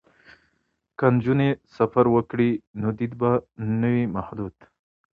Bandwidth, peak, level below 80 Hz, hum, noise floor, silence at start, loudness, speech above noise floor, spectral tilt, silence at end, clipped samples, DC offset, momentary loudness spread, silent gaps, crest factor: 5.2 kHz; -4 dBFS; -54 dBFS; none; -72 dBFS; 1 s; -23 LUFS; 50 dB; -10.5 dB/octave; 0.65 s; under 0.1%; under 0.1%; 11 LU; 2.67-2.74 s; 20 dB